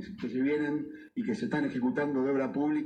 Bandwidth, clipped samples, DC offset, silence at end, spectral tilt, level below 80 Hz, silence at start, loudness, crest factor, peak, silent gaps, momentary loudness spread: 9 kHz; under 0.1%; under 0.1%; 0 s; -7.5 dB/octave; -68 dBFS; 0 s; -31 LUFS; 12 dB; -18 dBFS; none; 7 LU